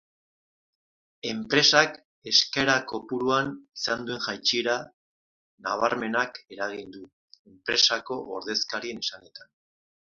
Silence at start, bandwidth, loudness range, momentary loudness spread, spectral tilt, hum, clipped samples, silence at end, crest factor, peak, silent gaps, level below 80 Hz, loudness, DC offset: 1.25 s; 7.6 kHz; 5 LU; 14 LU; -2 dB/octave; none; under 0.1%; 0.7 s; 26 dB; -2 dBFS; 2.05-2.22 s, 4.94-5.58 s, 7.13-7.28 s, 7.39-7.45 s; -68 dBFS; -25 LUFS; under 0.1%